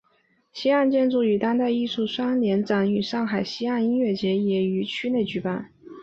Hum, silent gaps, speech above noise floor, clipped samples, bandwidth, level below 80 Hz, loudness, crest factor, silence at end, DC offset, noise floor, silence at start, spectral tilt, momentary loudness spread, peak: none; none; 42 dB; under 0.1%; 7.6 kHz; -64 dBFS; -24 LUFS; 14 dB; 0 s; under 0.1%; -65 dBFS; 0.55 s; -7 dB/octave; 6 LU; -10 dBFS